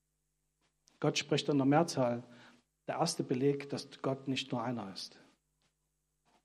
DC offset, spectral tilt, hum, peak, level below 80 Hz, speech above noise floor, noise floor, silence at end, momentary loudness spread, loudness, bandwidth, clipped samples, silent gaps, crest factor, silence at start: under 0.1%; -5 dB/octave; none; -14 dBFS; -80 dBFS; 49 dB; -83 dBFS; 1.35 s; 13 LU; -34 LUFS; 13.5 kHz; under 0.1%; none; 22 dB; 1 s